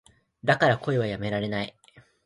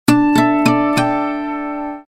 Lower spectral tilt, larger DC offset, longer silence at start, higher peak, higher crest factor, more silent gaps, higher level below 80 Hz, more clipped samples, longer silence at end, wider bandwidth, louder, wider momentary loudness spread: about the same, -6.5 dB/octave vs -5.5 dB/octave; neither; first, 0.45 s vs 0.1 s; second, -6 dBFS vs 0 dBFS; about the same, 20 dB vs 16 dB; neither; second, -58 dBFS vs -48 dBFS; neither; first, 0.25 s vs 0.1 s; second, 11.5 kHz vs 16 kHz; second, -26 LUFS vs -16 LUFS; about the same, 10 LU vs 11 LU